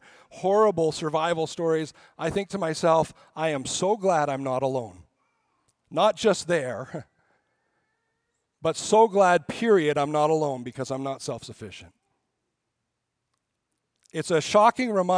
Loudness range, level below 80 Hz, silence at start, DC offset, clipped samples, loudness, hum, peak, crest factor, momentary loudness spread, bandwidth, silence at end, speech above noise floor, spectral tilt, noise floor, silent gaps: 9 LU; -64 dBFS; 0.35 s; under 0.1%; under 0.1%; -24 LUFS; none; -6 dBFS; 20 dB; 14 LU; 10.5 kHz; 0 s; 57 dB; -4.5 dB/octave; -81 dBFS; none